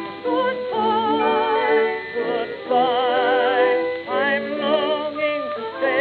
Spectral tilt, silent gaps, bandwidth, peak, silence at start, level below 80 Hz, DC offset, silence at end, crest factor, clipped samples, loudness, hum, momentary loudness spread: -7 dB/octave; none; 4.8 kHz; -6 dBFS; 0 s; -70 dBFS; under 0.1%; 0 s; 14 dB; under 0.1%; -20 LUFS; none; 6 LU